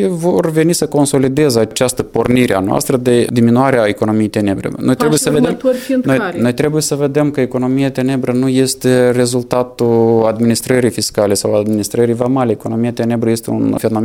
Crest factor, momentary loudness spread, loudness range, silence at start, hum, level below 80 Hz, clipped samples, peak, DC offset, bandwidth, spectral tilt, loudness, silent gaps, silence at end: 12 dB; 5 LU; 2 LU; 0 s; none; -46 dBFS; under 0.1%; 0 dBFS; under 0.1%; 17.5 kHz; -5.5 dB/octave; -14 LUFS; none; 0 s